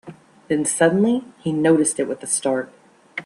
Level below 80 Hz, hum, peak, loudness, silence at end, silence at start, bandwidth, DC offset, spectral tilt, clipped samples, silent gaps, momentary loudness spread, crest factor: -64 dBFS; none; -2 dBFS; -20 LUFS; 0 s; 0.05 s; 12.5 kHz; under 0.1%; -4.5 dB/octave; under 0.1%; none; 9 LU; 18 dB